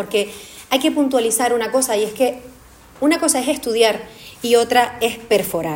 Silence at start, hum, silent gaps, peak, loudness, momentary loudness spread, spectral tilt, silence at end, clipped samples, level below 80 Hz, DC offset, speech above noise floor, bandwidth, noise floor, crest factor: 0 s; none; none; -2 dBFS; -18 LUFS; 11 LU; -2.5 dB/octave; 0 s; under 0.1%; -54 dBFS; under 0.1%; 26 dB; 17 kHz; -44 dBFS; 18 dB